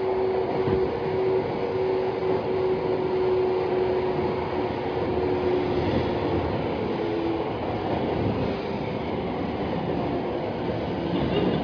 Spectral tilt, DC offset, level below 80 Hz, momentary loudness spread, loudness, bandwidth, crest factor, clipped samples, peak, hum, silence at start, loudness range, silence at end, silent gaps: -8.5 dB/octave; under 0.1%; -44 dBFS; 4 LU; -26 LUFS; 5.4 kHz; 14 dB; under 0.1%; -12 dBFS; none; 0 s; 3 LU; 0 s; none